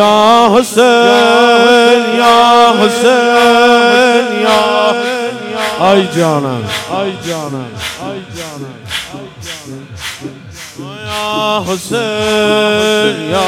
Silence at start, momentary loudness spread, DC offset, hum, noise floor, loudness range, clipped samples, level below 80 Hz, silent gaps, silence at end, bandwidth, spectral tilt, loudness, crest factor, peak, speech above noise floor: 0 s; 18 LU; under 0.1%; none; -30 dBFS; 15 LU; 0.4%; -46 dBFS; none; 0 s; 16.5 kHz; -4 dB/octave; -10 LUFS; 10 dB; 0 dBFS; 21 dB